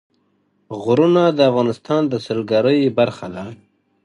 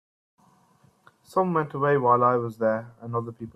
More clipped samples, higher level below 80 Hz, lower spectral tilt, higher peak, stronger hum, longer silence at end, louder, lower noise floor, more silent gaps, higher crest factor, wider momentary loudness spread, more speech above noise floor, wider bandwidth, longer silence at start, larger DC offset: neither; first, -60 dBFS vs -68 dBFS; about the same, -7.5 dB/octave vs -8.5 dB/octave; first, -2 dBFS vs -8 dBFS; neither; first, 0.5 s vs 0.05 s; first, -17 LUFS vs -24 LUFS; about the same, -63 dBFS vs -61 dBFS; neither; about the same, 16 dB vs 18 dB; first, 16 LU vs 12 LU; first, 47 dB vs 37 dB; second, 11 kHz vs 14 kHz; second, 0.7 s vs 1.3 s; neither